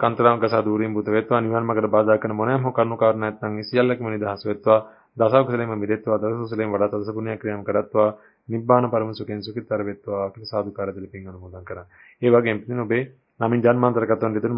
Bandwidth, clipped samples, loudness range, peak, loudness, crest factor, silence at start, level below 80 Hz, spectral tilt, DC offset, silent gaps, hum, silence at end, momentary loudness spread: 5.4 kHz; under 0.1%; 4 LU; -2 dBFS; -22 LUFS; 20 dB; 0 s; -58 dBFS; -12 dB/octave; under 0.1%; none; none; 0 s; 12 LU